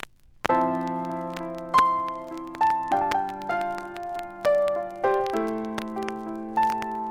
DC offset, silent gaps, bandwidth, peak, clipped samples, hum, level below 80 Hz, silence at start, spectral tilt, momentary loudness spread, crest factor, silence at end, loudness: under 0.1%; none; 18 kHz; -4 dBFS; under 0.1%; none; -58 dBFS; 0.45 s; -5.5 dB/octave; 11 LU; 22 dB; 0 s; -26 LUFS